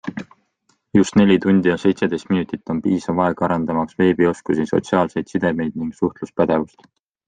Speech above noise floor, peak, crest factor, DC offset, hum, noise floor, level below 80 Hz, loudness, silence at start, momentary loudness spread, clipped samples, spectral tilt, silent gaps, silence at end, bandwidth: 47 dB; -2 dBFS; 16 dB; under 0.1%; none; -65 dBFS; -56 dBFS; -19 LUFS; 0.05 s; 9 LU; under 0.1%; -7 dB/octave; none; 0.6 s; 9.4 kHz